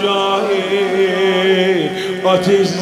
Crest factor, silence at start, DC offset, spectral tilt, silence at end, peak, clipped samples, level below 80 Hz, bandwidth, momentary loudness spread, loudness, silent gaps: 14 dB; 0 s; under 0.1%; -5 dB/octave; 0 s; -2 dBFS; under 0.1%; -58 dBFS; 13.5 kHz; 4 LU; -15 LUFS; none